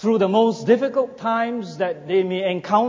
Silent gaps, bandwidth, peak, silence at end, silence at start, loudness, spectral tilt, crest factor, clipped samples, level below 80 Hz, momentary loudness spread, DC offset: none; 7.6 kHz; -4 dBFS; 0 s; 0 s; -21 LUFS; -6.5 dB/octave; 16 dB; under 0.1%; -68 dBFS; 8 LU; under 0.1%